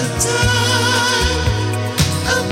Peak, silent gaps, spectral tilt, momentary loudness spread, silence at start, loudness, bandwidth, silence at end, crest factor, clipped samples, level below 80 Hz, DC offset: -4 dBFS; none; -3.5 dB/octave; 4 LU; 0 s; -16 LUFS; 16.5 kHz; 0 s; 12 dB; under 0.1%; -28 dBFS; under 0.1%